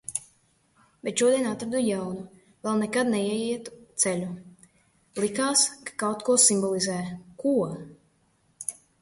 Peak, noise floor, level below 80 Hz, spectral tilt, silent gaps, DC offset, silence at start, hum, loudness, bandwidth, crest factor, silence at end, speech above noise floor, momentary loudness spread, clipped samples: -4 dBFS; -67 dBFS; -66 dBFS; -3 dB/octave; none; under 0.1%; 0.1 s; none; -25 LUFS; 12 kHz; 24 dB; 0.3 s; 41 dB; 16 LU; under 0.1%